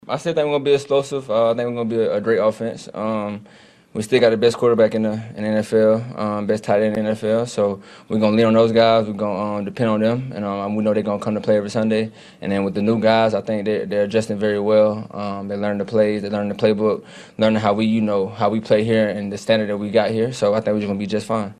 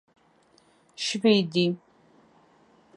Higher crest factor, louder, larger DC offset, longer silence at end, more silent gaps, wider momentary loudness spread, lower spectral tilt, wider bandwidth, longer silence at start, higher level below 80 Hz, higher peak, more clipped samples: about the same, 18 dB vs 22 dB; first, -19 LUFS vs -24 LUFS; neither; second, 0.05 s vs 1.2 s; neither; about the same, 9 LU vs 10 LU; first, -6.5 dB/octave vs -5 dB/octave; about the same, 11.5 kHz vs 11 kHz; second, 0.05 s vs 1 s; first, -58 dBFS vs -76 dBFS; first, -2 dBFS vs -8 dBFS; neither